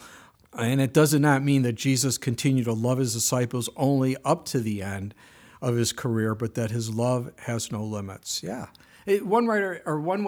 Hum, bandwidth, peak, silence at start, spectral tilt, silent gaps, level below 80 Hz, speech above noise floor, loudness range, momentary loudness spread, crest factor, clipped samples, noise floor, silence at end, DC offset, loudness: none; 19.5 kHz; -8 dBFS; 0 s; -5 dB/octave; none; -64 dBFS; 26 dB; 5 LU; 12 LU; 18 dB; under 0.1%; -50 dBFS; 0 s; under 0.1%; -25 LUFS